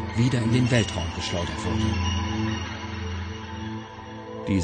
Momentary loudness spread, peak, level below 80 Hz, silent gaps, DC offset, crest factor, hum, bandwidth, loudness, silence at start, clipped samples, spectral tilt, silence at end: 13 LU; -6 dBFS; -40 dBFS; none; under 0.1%; 20 dB; none; 9.4 kHz; -27 LUFS; 0 s; under 0.1%; -5.5 dB/octave; 0 s